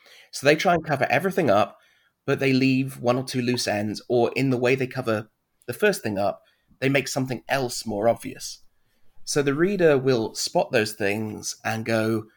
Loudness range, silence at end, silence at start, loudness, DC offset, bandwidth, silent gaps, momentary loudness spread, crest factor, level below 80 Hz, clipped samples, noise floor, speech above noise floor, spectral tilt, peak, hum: 3 LU; 0.1 s; 0.35 s; -23 LUFS; under 0.1%; 19 kHz; none; 9 LU; 20 dB; -58 dBFS; under 0.1%; -56 dBFS; 32 dB; -5 dB/octave; -4 dBFS; none